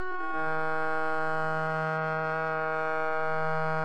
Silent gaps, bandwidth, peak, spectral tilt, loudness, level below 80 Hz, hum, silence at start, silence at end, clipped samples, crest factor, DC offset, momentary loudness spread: none; 10 kHz; -16 dBFS; -7 dB/octave; -30 LUFS; -66 dBFS; none; 0 s; 0 s; under 0.1%; 12 dB; under 0.1%; 1 LU